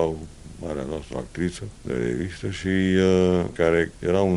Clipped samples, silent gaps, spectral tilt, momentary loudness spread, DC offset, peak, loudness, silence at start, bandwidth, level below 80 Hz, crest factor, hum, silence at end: under 0.1%; none; -6.5 dB/octave; 15 LU; under 0.1%; -6 dBFS; -24 LUFS; 0 s; 11.5 kHz; -44 dBFS; 18 dB; none; 0 s